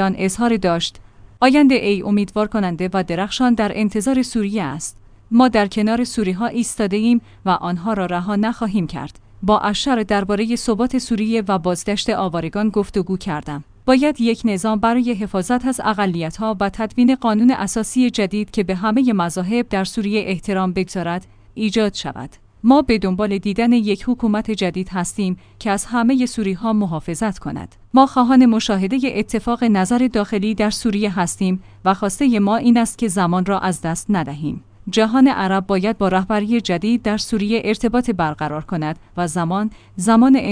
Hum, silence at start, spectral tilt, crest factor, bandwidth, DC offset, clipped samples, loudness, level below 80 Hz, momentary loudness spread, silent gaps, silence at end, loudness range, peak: none; 0 s; -5.5 dB/octave; 18 dB; 10.5 kHz; under 0.1%; under 0.1%; -18 LUFS; -42 dBFS; 9 LU; none; 0 s; 3 LU; 0 dBFS